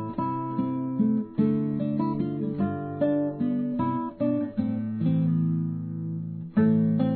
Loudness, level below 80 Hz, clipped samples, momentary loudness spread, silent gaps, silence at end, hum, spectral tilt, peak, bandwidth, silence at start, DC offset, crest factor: -27 LUFS; -60 dBFS; under 0.1%; 6 LU; none; 0 s; none; -13 dB/octave; -12 dBFS; 4.5 kHz; 0 s; under 0.1%; 14 dB